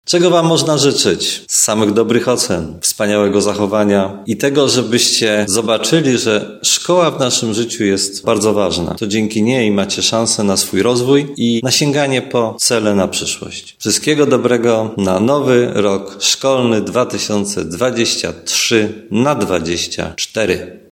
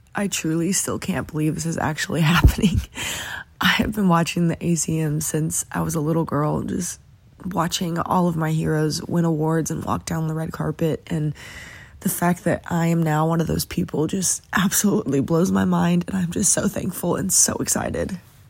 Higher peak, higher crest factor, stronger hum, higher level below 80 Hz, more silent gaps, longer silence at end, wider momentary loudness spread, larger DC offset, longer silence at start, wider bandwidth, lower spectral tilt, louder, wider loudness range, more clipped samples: about the same, 0 dBFS vs -2 dBFS; second, 14 dB vs 20 dB; neither; second, -50 dBFS vs -36 dBFS; neither; second, 0.15 s vs 0.3 s; about the same, 6 LU vs 8 LU; neither; about the same, 0.05 s vs 0.15 s; about the same, 17 kHz vs 16.5 kHz; about the same, -3.5 dB/octave vs -4.5 dB/octave; first, -14 LUFS vs -21 LUFS; about the same, 2 LU vs 4 LU; neither